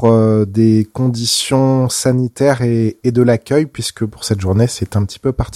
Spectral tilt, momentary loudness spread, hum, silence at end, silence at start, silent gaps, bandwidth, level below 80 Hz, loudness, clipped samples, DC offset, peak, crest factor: -5.5 dB/octave; 6 LU; none; 0 s; 0 s; none; 15 kHz; -38 dBFS; -15 LUFS; under 0.1%; under 0.1%; 0 dBFS; 14 dB